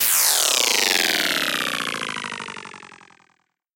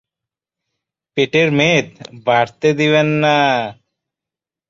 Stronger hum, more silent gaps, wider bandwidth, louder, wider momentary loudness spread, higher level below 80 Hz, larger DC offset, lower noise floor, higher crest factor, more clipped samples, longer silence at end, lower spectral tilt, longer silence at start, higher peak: neither; neither; first, 17.5 kHz vs 7.6 kHz; second, -19 LUFS vs -15 LUFS; first, 17 LU vs 11 LU; second, -66 dBFS vs -58 dBFS; neither; second, -66 dBFS vs -87 dBFS; about the same, 20 dB vs 16 dB; neither; second, 0.8 s vs 0.95 s; second, 0.5 dB/octave vs -5.5 dB/octave; second, 0 s vs 1.15 s; about the same, -2 dBFS vs -2 dBFS